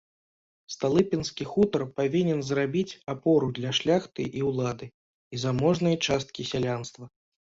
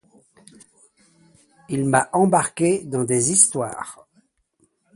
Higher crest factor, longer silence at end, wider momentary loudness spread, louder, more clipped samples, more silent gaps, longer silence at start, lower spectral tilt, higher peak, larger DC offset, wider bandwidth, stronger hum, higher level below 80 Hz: about the same, 18 dB vs 22 dB; second, 0.45 s vs 1 s; second, 9 LU vs 14 LU; second, -27 LUFS vs -19 LUFS; neither; first, 4.94-5.31 s vs none; second, 0.7 s vs 1.7 s; about the same, -5.5 dB/octave vs -4.5 dB/octave; second, -10 dBFS vs 0 dBFS; neither; second, 7.8 kHz vs 11.5 kHz; neither; about the same, -58 dBFS vs -62 dBFS